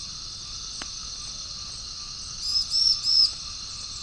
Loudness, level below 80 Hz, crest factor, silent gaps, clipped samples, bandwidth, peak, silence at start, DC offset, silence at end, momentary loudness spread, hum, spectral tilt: -25 LUFS; -48 dBFS; 18 dB; none; under 0.1%; 10.5 kHz; -10 dBFS; 0 s; under 0.1%; 0 s; 15 LU; none; 0.5 dB/octave